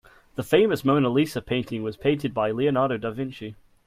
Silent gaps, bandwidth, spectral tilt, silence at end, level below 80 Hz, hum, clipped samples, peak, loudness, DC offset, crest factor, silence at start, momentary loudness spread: none; 15.5 kHz; -6.5 dB/octave; 0.35 s; -56 dBFS; none; under 0.1%; -8 dBFS; -24 LUFS; under 0.1%; 18 dB; 0.4 s; 14 LU